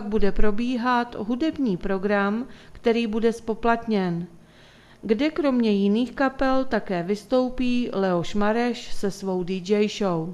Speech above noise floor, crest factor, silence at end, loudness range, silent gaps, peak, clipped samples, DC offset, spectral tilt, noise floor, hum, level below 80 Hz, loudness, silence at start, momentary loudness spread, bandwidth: 28 dB; 18 dB; 0 s; 2 LU; none; -6 dBFS; under 0.1%; under 0.1%; -6.5 dB/octave; -51 dBFS; none; -40 dBFS; -24 LUFS; 0 s; 6 LU; 12 kHz